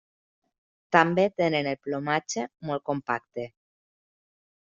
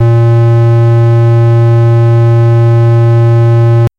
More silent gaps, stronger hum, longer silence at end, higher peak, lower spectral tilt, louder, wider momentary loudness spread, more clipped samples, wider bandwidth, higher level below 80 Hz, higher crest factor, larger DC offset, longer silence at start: neither; neither; first, 1.15 s vs 0.1 s; about the same, -4 dBFS vs -4 dBFS; second, -4 dB/octave vs -10 dB/octave; second, -26 LUFS vs -7 LUFS; first, 12 LU vs 0 LU; neither; first, 7.4 kHz vs 4.6 kHz; second, -68 dBFS vs -38 dBFS; first, 26 dB vs 2 dB; neither; first, 0.9 s vs 0 s